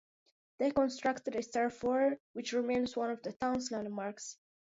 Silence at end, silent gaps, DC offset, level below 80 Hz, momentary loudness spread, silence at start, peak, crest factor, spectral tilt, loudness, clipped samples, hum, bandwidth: 0.35 s; 2.20-2.34 s, 3.36-3.40 s; under 0.1%; -68 dBFS; 9 LU; 0.6 s; -18 dBFS; 16 dB; -3.5 dB/octave; -35 LUFS; under 0.1%; none; 7.6 kHz